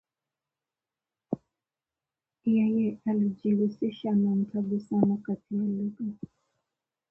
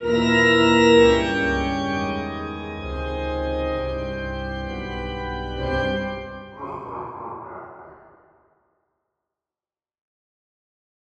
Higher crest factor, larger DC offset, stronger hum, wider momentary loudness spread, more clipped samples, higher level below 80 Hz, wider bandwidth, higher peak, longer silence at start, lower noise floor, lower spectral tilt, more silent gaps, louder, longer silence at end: about the same, 20 dB vs 20 dB; neither; neither; second, 12 LU vs 19 LU; neither; second, -70 dBFS vs -38 dBFS; second, 5.4 kHz vs 9 kHz; second, -10 dBFS vs -4 dBFS; first, 1.3 s vs 0 s; about the same, under -90 dBFS vs under -90 dBFS; first, -10.5 dB/octave vs -5.5 dB/octave; neither; second, -29 LUFS vs -22 LUFS; second, 0.95 s vs 3.15 s